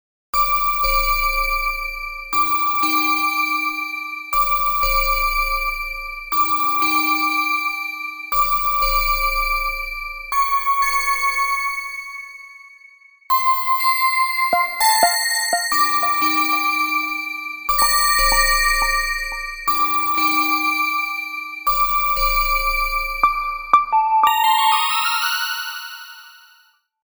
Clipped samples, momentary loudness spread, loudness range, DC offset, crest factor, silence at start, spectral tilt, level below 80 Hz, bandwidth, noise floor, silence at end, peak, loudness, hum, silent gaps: under 0.1%; 10 LU; 3 LU; under 0.1%; 18 dB; 0.35 s; -0.5 dB/octave; -34 dBFS; over 20 kHz; -56 dBFS; 0.75 s; -2 dBFS; -18 LUFS; none; none